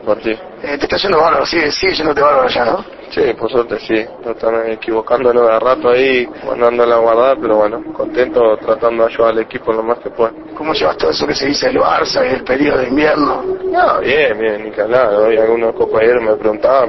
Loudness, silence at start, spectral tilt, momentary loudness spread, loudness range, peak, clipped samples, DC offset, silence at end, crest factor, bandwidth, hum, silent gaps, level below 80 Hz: -13 LUFS; 0 s; -4.5 dB/octave; 7 LU; 3 LU; 0 dBFS; under 0.1%; under 0.1%; 0 s; 14 dB; 6.2 kHz; none; none; -44 dBFS